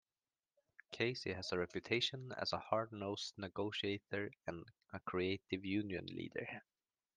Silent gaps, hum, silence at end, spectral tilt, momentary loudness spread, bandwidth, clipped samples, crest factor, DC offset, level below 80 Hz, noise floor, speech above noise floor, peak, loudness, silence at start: none; none; 0.55 s; -5 dB/octave; 11 LU; 9.8 kHz; under 0.1%; 22 dB; under 0.1%; -78 dBFS; under -90 dBFS; over 48 dB; -22 dBFS; -42 LUFS; 0.9 s